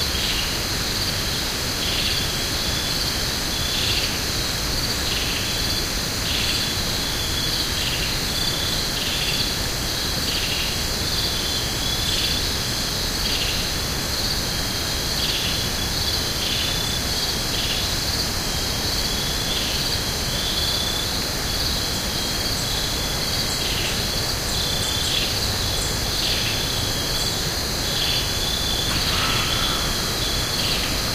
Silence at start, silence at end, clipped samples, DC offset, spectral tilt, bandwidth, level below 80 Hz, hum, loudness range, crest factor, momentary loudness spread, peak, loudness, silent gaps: 0 s; 0 s; under 0.1%; under 0.1%; -2 dB/octave; 16 kHz; -32 dBFS; none; 1 LU; 16 dB; 2 LU; -8 dBFS; -21 LUFS; none